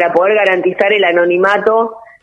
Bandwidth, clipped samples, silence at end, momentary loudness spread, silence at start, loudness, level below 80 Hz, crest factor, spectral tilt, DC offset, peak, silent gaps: 8.6 kHz; under 0.1%; 0.2 s; 3 LU; 0 s; -12 LUFS; -60 dBFS; 12 dB; -5.5 dB/octave; under 0.1%; 0 dBFS; none